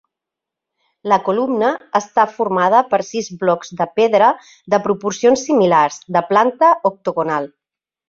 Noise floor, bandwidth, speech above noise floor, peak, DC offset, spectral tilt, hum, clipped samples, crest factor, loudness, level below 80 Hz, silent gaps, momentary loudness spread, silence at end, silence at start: -84 dBFS; 7.8 kHz; 68 dB; 0 dBFS; under 0.1%; -5 dB/octave; none; under 0.1%; 16 dB; -16 LUFS; -64 dBFS; none; 8 LU; 0.6 s; 1.05 s